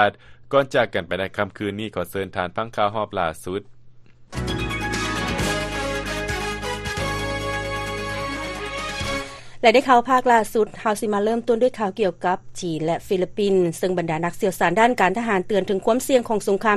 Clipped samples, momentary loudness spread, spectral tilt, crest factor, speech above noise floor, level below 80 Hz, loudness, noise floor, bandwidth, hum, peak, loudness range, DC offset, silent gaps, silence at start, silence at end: under 0.1%; 10 LU; -4.5 dB/octave; 20 dB; 24 dB; -40 dBFS; -22 LUFS; -45 dBFS; 13 kHz; none; -2 dBFS; 7 LU; under 0.1%; none; 0 s; 0 s